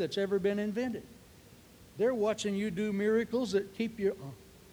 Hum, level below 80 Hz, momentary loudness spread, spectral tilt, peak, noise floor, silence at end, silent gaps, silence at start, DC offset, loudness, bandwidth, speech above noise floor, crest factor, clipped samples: none; -64 dBFS; 15 LU; -5.5 dB/octave; -18 dBFS; -56 dBFS; 0.15 s; none; 0 s; under 0.1%; -32 LUFS; over 20 kHz; 25 dB; 14 dB; under 0.1%